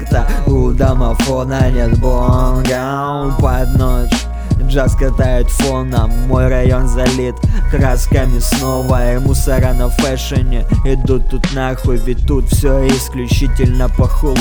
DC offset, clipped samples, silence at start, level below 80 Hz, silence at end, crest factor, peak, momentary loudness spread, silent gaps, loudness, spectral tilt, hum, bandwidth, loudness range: under 0.1%; under 0.1%; 0 s; -14 dBFS; 0 s; 12 dB; 0 dBFS; 4 LU; none; -15 LUFS; -6 dB/octave; none; 20 kHz; 1 LU